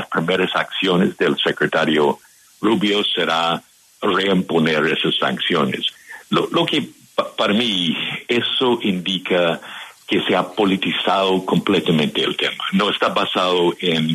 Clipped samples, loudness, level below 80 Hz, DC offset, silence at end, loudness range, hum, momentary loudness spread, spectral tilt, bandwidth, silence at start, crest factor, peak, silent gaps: under 0.1%; -18 LUFS; -62 dBFS; under 0.1%; 0 s; 2 LU; none; 6 LU; -5 dB/octave; 13.5 kHz; 0 s; 14 dB; -4 dBFS; none